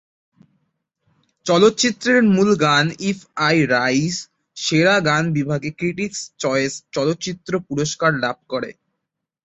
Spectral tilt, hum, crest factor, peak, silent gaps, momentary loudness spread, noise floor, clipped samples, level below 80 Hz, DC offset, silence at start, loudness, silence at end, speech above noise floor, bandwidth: -4.5 dB/octave; none; 18 dB; -2 dBFS; none; 11 LU; -79 dBFS; under 0.1%; -58 dBFS; under 0.1%; 1.45 s; -19 LUFS; 0.75 s; 61 dB; 8.2 kHz